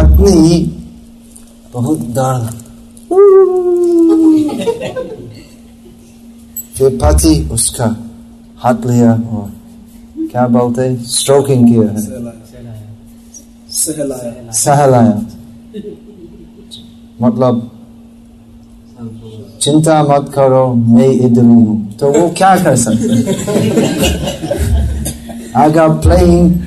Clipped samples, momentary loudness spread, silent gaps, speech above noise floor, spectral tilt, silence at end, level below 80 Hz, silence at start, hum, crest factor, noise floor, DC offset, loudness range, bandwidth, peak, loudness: under 0.1%; 21 LU; none; 28 dB; -6 dB/octave; 0 s; -22 dBFS; 0 s; none; 12 dB; -38 dBFS; under 0.1%; 6 LU; 13.5 kHz; 0 dBFS; -11 LUFS